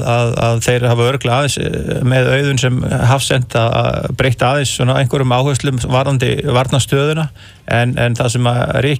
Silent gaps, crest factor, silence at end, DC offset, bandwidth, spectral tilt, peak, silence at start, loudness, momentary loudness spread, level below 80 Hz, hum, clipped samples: none; 12 dB; 0 s; under 0.1%; 15.5 kHz; -5.5 dB/octave; -2 dBFS; 0 s; -14 LUFS; 4 LU; -36 dBFS; none; under 0.1%